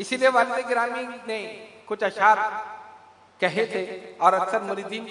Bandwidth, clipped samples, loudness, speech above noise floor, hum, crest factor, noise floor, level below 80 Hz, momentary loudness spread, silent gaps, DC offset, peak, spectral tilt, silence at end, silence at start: 11 kHz; under 0.1%; -24 LUFS; 26 dB; none; 22 dB; -50 dBFS; -78 dBFS; 15 LU; none; under 0.1%; -4 dBFS; -3.5 dB/octave; 0 s; 0 s